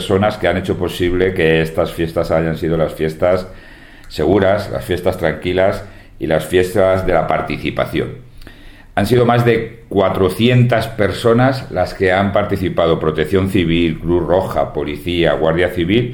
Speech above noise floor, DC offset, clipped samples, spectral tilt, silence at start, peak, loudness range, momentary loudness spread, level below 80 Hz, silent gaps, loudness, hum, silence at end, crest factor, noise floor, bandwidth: 22 dB; under 0.1%; under 0.1%; -7 dB/octave; 0 s; 0 dBFS; 3 LU; 7 LU; -34 dBFS; none; -16 LUFS; none; 0 s; 16 dB; -37 dBFS; 19 kHz